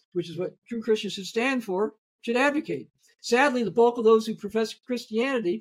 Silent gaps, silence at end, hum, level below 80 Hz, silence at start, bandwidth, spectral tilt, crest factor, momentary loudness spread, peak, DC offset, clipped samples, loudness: 0.58-0.62 s, 1.98-2.19 s; 0 s; none; -72 dBFS; 0.15 s; 14.5 kHz; -4.5 dB/octave; 18 dB; 12 LU; -8 dBFS; under 0.1%; under 0.1%; -26 LUFS